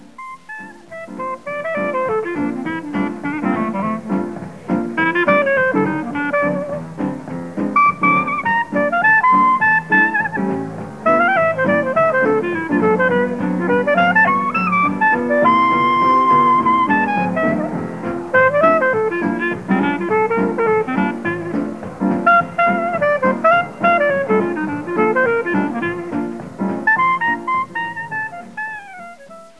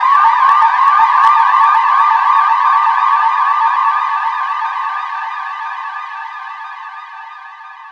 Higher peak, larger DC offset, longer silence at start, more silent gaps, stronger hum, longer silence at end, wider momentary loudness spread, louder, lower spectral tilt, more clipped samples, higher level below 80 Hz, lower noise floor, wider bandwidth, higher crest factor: about the same, -2 dBFS vs 0 dBFS; first, 0.4% vs under 0.1%; first, 0.2 s vs 0 s; neither; neither; first, 0.15 s vs 0 s; second, 12 LU vs 20 LU; second, -16 LUFS vs -12 LUFS; first, -7 dB/octave vs 1.5 dB/octave; neither; first, -56 dBFS vs -72 dBFS; first, -39 dBFS vs -33 dBFS; first, 11 kHz vs 8 kHz; about the same, 16 dB vs 12 dB